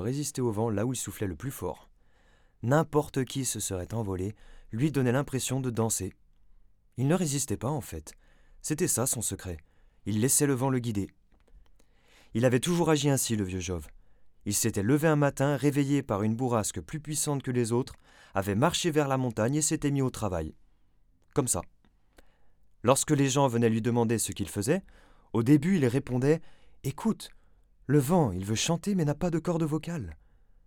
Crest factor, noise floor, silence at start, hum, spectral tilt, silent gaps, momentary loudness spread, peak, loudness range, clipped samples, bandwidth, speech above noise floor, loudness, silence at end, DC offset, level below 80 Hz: 22 dB; -63 dBFS; 0 s; none; -5 dB/octave; none; 13 LU; -8 dBFS; 4 LU; under 0.1%; 18.5 kHz; 35 dB; -28 LUFS; 0.5 s; under 0.1%; -56 dBFS